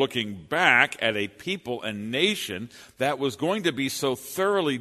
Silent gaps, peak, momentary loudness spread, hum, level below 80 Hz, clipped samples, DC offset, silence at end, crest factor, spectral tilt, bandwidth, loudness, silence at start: none; -4 dBFS; 12 LU; none; -66 dBFS; under 0.1%; under 0.1%; 0 s; 22 dB; -3.5 dB/octave; 13.5 kHz; -25 LUFS; 0 s